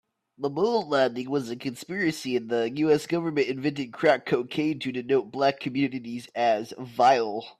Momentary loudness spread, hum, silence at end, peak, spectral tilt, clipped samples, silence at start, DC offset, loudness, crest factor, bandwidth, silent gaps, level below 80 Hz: 9 LU; none; 0.1 s; -8 dBFS; -5.5 dB/octave; under 0.1%; 0.4 s; under 0.1%; -26 LUFS; 18 dB; 14.5 kHz; none; -70 dBFS